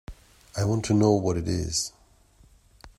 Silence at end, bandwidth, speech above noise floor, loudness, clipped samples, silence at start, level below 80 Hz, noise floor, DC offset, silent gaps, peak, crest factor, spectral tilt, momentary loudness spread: 0.1 s; 12.5 kHz; 33 dB; -25 LUFS; under 0.1%; 0.1 s; -48 dBFS; -57 dBFS; under 0.1%; none; -8 dBFS; 20 dB; -5.5 dB/octave; 10 LU